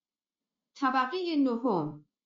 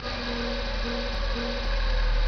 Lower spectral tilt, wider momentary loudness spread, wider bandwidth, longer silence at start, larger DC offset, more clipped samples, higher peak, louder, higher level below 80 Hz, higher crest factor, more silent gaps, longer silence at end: about the same, -4 dB/octave vs -5 dB/octave; first, 5 LU vs 2 LU; first, 7.4 kHz vs 6.4 kHz; first, 0.75 s vs 0 s; second, under 0.1% vs 0.3%; neither; about the same, -16 dBFS vs -14 dBFS; about the same, -30 LUFS vs -30 LUFS; second, -80 dBFS vs -28 dBFS; about the same, 16 dB vs 12 dB; neither; first, 0.25 s vs 0 s